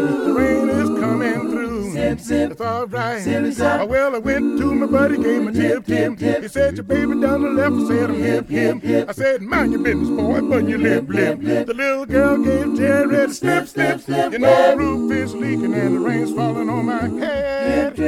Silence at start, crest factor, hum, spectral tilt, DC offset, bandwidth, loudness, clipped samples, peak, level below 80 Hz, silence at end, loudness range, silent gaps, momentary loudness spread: 0 s; 16 dB; none; -6.5 dB/octave; under 0.1%; 15 kHz; -18 LUFS; under 0.1%; -2 dBFS; -42 dBFS; 0 s; 3 LU; none; 5 LU